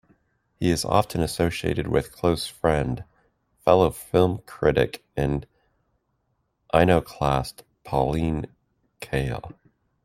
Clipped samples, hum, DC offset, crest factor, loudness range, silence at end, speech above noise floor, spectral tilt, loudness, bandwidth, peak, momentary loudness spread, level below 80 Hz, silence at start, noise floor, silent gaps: under 0.1%; none; under 0.1%; 22 dB; 2 LU; 0.55 s; 50 dB; -6 dB/octave; -24 LUFS; 16 kHz; -2 dBFS; 11 LU; -42 dBFS; 0.6 s; -73 dBFS; none